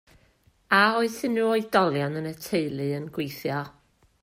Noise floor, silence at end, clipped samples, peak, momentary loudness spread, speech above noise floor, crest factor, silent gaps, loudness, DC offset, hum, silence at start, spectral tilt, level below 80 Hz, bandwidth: -63 dBFS; 0.55 s; under 0.1%; -6 dBFS; 12 LU; 38 dB; 20 dB; none; -25 LUFS; under 0.1%; none; 0.7 s; -5.5 dB/octave; -64 dBFS; 16 kHz